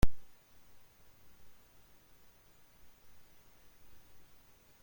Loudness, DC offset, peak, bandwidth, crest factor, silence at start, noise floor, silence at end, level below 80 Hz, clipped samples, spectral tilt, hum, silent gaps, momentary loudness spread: -55 LUFS; under 0.1%; -12 dBFS; 16.5 kHz; 24 dB; 0 s; -62 dBFS; 0.55 s; -46 dBFS; under 0.1%; -6 dB/octave; none; none; 1 LU